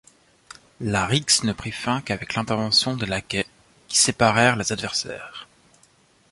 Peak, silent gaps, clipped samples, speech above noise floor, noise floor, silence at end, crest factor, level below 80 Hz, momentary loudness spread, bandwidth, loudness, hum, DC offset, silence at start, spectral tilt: -4 dBFS; none; under 0.1%; 36 dB; -58 dBFS; 0.85 s; 22 dB; -50 dBFS; 15 LU; 11.5 kHz; -21 LUFS; none; under 0.1%; 0.8 s; -3 dB/octave